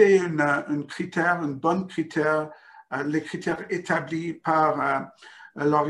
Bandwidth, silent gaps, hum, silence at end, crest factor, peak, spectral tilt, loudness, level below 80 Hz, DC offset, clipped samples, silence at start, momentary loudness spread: 11 kHz; none; none; 0 s; 20 dB; -6 dBFS; -6.5 dB/octave; -25 LUFS; -68 dBFS; under 0.1%; under 0.1%; 0 s; 9 LU